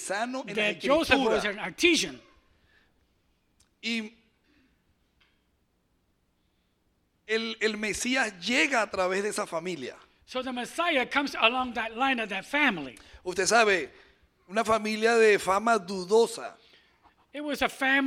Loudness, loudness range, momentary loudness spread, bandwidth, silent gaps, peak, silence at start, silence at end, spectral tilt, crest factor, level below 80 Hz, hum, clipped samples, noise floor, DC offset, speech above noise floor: -26 LUFS; 15 LU; 14 LU; 16 kHz; none; -6 dBFS; 0 s; 0 s; -2.5 dB/octave; 22 dB; -60 dBFS; none; under 0.1%; -72 dBFS; under 0.1%; 45 dB